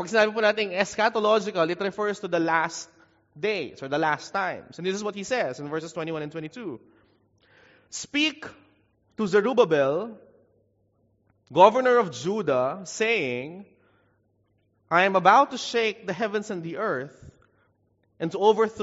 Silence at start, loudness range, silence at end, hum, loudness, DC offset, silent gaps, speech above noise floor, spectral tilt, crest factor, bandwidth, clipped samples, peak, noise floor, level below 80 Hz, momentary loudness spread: 0 s; 8 LU; 0 s; none; -24 LUFS; under 0.1%; none; 44 dB; -2.5 dB/octave; 24 dB; 8 kHz; under 0.1%; -2 dBFS; -68 dBFS; -70 dBFS; 17 LU